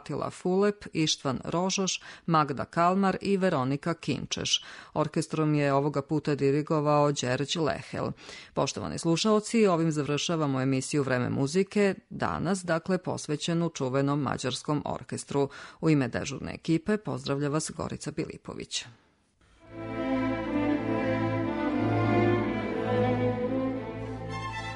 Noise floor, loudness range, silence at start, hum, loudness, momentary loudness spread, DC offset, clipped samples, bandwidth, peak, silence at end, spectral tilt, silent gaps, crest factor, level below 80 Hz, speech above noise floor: -64 dBFS; 5 LU; 0.05 s; none; -28 LUFS; 10 LU; under 0.1%; under 0.1%; 10.5 kHz; -12 dBFS; 0 s; -5 dB/octave; none; 16 dB; -56 dBFS; 36 dB